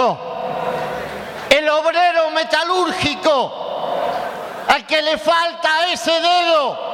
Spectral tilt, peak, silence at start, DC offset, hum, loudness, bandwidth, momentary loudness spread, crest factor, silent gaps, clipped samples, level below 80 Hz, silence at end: -3 dB/octave; 0 dBFS; 0 s; under 0.1%; none; -17 LUFS; 16.5 kHz; 10 LU; 18 dB; none; under 0.1%; -52 dBFS; 0 s